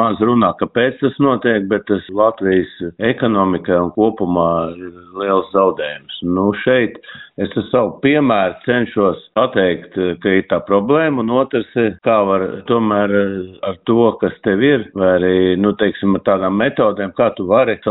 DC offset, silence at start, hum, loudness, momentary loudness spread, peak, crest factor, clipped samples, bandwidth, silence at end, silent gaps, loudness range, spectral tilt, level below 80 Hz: under 0.1%; 0 s; none; -16 LUFS; 7 LU; 0 dBFS; 14 dB; under 0.1%; 4 kHz; 0 s; none; 2 LU; -5 dB/octave; -50 dBFS